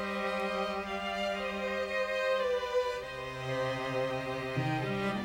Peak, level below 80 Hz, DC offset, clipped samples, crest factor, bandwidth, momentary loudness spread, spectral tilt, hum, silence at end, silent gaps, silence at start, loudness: -20 dBFS; -58 dBFS; under 0.1%; under 0.1%; 14 dB; 16.5 kHz; 5 LU; -5.5 dB/octave; none; 0 s; none; 0 s; -33 LUFS